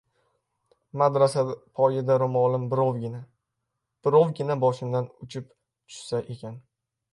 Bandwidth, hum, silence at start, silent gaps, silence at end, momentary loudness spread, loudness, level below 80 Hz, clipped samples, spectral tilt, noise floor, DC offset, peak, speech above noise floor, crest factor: 11.5 kHz; none; 0.95 s; none; 0.55 s; 18 LU; -25 LUFS; -70 dBFS; under 0.1%; -7.5 dB/octave; -82 dBFS; under 0.1%; -8 dBFS; 57 dB; 20 dB